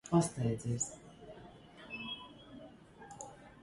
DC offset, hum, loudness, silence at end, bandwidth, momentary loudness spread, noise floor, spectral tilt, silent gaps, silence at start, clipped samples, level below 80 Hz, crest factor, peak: under 0.1%; none; -38 LUFS; 0 s; 11.5 kHz; 21 LU; -55 dBFS; -5 dB/octave; none; 0.05 s; under 0.1%; -64 dBFS; 22 dB; -18 dBFS